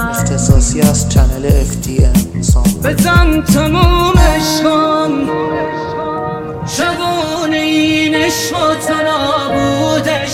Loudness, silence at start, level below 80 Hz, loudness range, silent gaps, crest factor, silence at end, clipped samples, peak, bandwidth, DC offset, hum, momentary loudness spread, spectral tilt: -13 LUFS; 0 s; -18 dBFS; 4 LU; none; 12 dB; 0 s; 0.3%; 0 dBFS; 17 kHz; 0.1%; none; 7 LU; -5 dB/octave